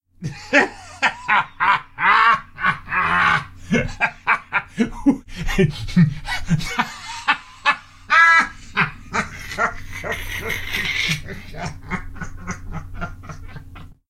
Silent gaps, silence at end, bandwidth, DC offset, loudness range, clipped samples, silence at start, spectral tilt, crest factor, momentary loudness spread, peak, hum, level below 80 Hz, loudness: none; 0.15 s; 16 kHz; under 0.1%; 8 LU; under 0.1%; 0.2 s; -4.5 dB/octave; 20 dB; 17 LU; 0 dBFS; none; -36 dBFS; -19 LUFS